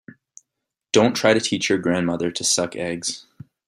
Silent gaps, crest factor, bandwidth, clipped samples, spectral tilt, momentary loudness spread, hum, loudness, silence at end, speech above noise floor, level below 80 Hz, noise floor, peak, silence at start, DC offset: none; 20 dB; 15 kHz; under 0.1%; -3.5 dB/octave; 9 LU; none; -20 LUFS; 0.45 s; 62 dB; -60 dBFS; -82 dBFS; -2 dBFS; 0.95 s; under 0.1%